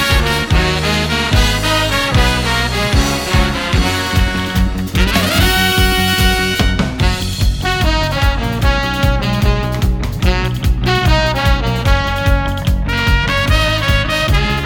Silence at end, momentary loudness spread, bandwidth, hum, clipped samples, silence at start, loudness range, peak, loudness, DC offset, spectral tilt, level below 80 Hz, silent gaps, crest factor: 0 s; 4 LU; 19.5 kHz; none; under 0.1%; 0 s; 2 LU; 0 dBFS; -14 LUFS; under 0.1%; -4.5 dB/octave; -18 dBFS; none; 14 dB